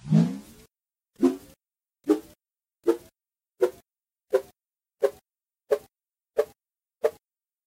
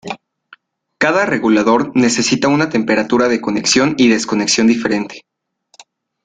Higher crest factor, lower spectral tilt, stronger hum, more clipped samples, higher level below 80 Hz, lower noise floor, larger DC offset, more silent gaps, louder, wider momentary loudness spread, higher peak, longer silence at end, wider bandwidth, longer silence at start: first, 22 dB vs 14 dB; first, -8 dB/octave vs -3.5 dB/octave; neither; neither; second, -68 dBFS vs -54 dBFS; first, -86 dBFS vs -58 dBFS; neither; neither; second, -28 LUFS vs -14 LUFS; about the same, 6 LU vs 6 LU; second, -8 dBFS vs -2 dBFS; second, 0.55 s vs 1.05 s; first, 16 kHz vs 9.4 kHz; about the same, 0.05 s vs 0.05 s